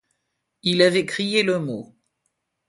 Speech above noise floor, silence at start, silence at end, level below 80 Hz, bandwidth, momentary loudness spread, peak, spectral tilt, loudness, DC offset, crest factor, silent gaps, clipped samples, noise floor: 56 dB; 0.65 s; 0.85 s; -66 dBFS; 11.5 kHz; 12 LU; -2 dBFS; -4.5 dB/octave; -21 LUFS; under 0.1%; 20 dB; none; under 0.1%; -77 dBFS